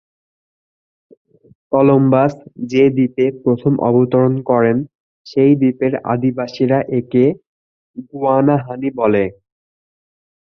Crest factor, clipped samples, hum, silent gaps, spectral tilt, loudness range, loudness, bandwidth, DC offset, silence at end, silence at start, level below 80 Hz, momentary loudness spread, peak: 14 dB; under 0.1%; none; 4.95-5.25 s, 7.47-7.94 s; -9.5 dB/octave; 3 LU; -15 LUFS; 6.6 kHz; under 0.1%; 1.1 s; 1.7 s; -56 dBFS; 10 LU; -2 dBFS